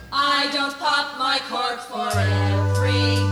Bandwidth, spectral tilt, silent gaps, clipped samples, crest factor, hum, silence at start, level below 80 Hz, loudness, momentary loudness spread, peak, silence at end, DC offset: 13.5 kHz; -5 dB/octave; none; under 0.1%; 14 dB; none; 0 s; -54 dBFS; -21 LUFS; 6 LU; -8 dBFS; 0 s; under 0.1%